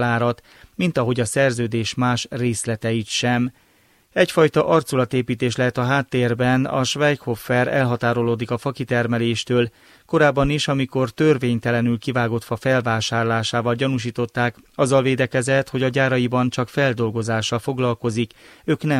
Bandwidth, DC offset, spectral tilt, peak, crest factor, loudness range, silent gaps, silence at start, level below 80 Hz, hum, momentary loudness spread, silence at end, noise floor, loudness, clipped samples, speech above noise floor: 15.5 kHz; under 0.1%; -5.5 dB/octave; -4 dBFS; 18 dB; 2 LU; none; 0 s; -48 dBFS; none; 6 LU; 0 s; -58 dBFS; -20 LUFS; under 0.1%; 38 dB